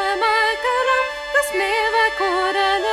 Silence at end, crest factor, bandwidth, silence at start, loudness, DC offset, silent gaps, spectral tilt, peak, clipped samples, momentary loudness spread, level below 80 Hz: 0 s; 14 dB; 16 kHz; 0 s; -18 LUFS; under 0.1%; none; -1 dB/octave; -4 dBFS; under 0.1%; 3 LU; -50 dBFS